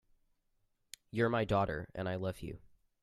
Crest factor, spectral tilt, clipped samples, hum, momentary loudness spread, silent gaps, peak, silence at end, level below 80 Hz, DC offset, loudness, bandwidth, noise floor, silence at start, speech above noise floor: 20 dB; -7 dB/octave; under 0.1%; none; 21 LU; none; -18 dBFS; 0.35 s; -58 dBFS; under 0.1%; -35 LUFS; 14.5 kHz; -78 dBFS; 1.15 s; 43 dB